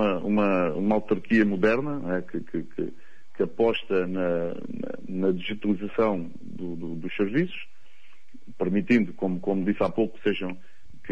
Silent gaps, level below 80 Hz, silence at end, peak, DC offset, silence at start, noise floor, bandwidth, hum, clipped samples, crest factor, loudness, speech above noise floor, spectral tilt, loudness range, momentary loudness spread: none; -60 dBFS; 0 s; -10 dBFS; 2%; 0 s; -59 dBFS; 7.4 kHz; none; under 0.1%; 16 dB; -27 LUFS; 33 dB; -8 dB/octave; 3 LU; 13 LU